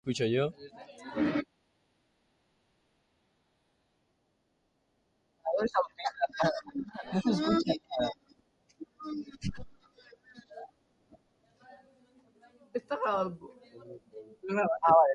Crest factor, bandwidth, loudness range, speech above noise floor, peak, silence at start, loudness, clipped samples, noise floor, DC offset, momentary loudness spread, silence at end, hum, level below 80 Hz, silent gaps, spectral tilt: 24 dB; 10 kHz; 14 LU; 46 dB; -10 dBFS; 0.05 s; -32 LUFS; under 0.1%; -75 dBFS; under 0.1%; 22 LU; 0 s; none; -62 dBFS; none; -6 dB/octave